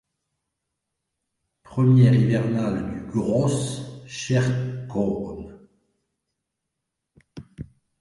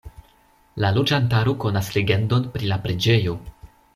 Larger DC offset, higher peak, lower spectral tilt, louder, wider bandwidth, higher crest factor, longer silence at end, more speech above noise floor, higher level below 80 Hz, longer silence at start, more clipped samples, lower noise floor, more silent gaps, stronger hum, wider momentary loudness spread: neither; about the same, -6 dBFS vs -4 dBFS; about the same, -7 dB/octave vs -6 dB/octave; about the same, -22 LUFS vs -21 LUFS; second, 11.5 kHz vs 14.5 kHz; about the same, 18 dB vs 18 dB; about the same, 0.35 s vs 0.3 s; first, 61 dB vs 37 dB; second, -52 dBFS vs -46 dBFS; first, 1.7 s vs 0.05 s; neither; first, -82 dBFS vs -57 dBFS; neither; neither; first, 23 LU vs 6 LU